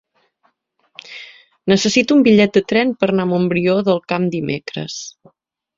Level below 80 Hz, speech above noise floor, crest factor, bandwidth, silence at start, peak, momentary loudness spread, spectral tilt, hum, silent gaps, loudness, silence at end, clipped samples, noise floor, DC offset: -56 dBFS; 48 dB; 16 dB; 7.8 kHz; 1.05 s; 0 dBFS; 21 LU; -5.5 dB/octave; none; none; -16 LUFS; 0.7 s; under 0.1%; -64 dBFS; under 0.1%